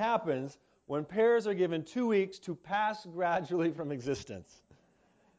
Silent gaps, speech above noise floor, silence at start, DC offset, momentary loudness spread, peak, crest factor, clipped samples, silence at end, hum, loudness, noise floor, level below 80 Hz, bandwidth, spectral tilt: none; 36 dB; 0 s; under 0.1%; 11 LU; -16 dBFS; 16 dB; under 0.1%; 0.95 s; none; -32 LUFS; -68 dBFS; -68 dBFS; 8 kHz; -6 dB/octave